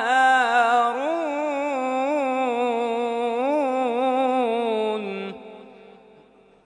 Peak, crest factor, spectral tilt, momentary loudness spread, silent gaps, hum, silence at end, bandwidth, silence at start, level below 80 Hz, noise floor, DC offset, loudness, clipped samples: -6 dBFS; 16 dB; -4 dB/octave; 10 LU; none; 50 Hz at -70 dBFS; 0.75 s; 11 kHz; 0 s; -74 dBFS; -53 dBFS; under 0.1%; -22 LUFS; under 0.1%